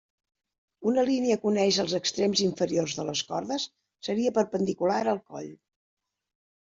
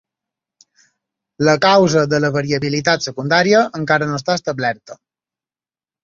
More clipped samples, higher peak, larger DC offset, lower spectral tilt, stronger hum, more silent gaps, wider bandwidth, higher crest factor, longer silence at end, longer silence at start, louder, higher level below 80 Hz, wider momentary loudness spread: neither; second, -10 dBFS vs -2 dBFS; neither; about the same, -4 dB/octave vs -5 dB/octave; neither; neither; about the same, 7.8 kHz vs 7.6 kHz; about the same, 18 dB vs 16 dB; about the same, 1.05 s vs 1.1 s; second, 0.8 s vs 1.4 s; second, -27 LUFS vs -16 LUFS; second, -68 dBFS vs -56 dBFS; about the same, 9 LU vs 8 LU